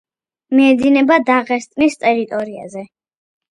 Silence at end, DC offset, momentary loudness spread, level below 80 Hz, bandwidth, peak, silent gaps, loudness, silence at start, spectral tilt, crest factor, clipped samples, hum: 0.75 s; under 0.1%; 17 LU; -58 dBFS; 10.5 kHz; 0 dBFS; none; -14 LUFS; 0.5 s; -4.5 dB/octave; 16 dB; under 0.1%; none